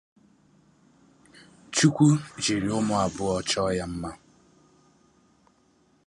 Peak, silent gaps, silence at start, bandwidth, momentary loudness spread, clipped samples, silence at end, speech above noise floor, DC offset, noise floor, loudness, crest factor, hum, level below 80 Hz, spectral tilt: -6 dBFS; none; 1.7 s; 11.5 kHz; 12 LU; under 0.1%; 1.95 s; 40 dB; under 0.1%; -64 dBFS; -25 LUFS; 22 dB; none; -54 dBFS; -5 dB/octave